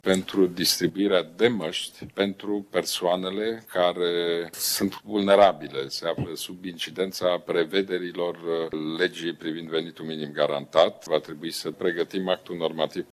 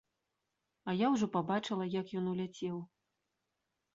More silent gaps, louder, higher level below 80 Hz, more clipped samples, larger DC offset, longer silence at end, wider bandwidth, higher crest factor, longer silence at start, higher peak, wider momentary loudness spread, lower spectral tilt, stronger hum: neither; first, -26 LUFS vs -36 LUFS; first, -64 dBFS vs -76 dBFS; neither; neither; second, 0.1 s vs 1.1 s; first, 15 kHz vs 7.6 kHz; about the same, 20 dB vs 18 dB; second, 0.05 s vs 0.85 s; first, -6 dBFS vs -18 dBFS; second, 10 LU vs 13 LU; second, -4 dB/octave vs -5.5 dB/octave; neither